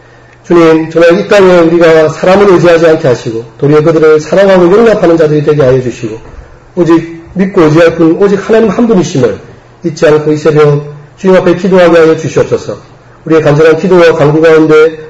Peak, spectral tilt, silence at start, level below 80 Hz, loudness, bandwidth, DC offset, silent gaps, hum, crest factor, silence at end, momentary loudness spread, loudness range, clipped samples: 0 dBFS; -7 dB/octave; 0.5 s; -38 dBFS; -6 LUFS; 8 kHz; 0.2%; none; none; 6 dB; 0 s; 11 LU; 3 LU; 6%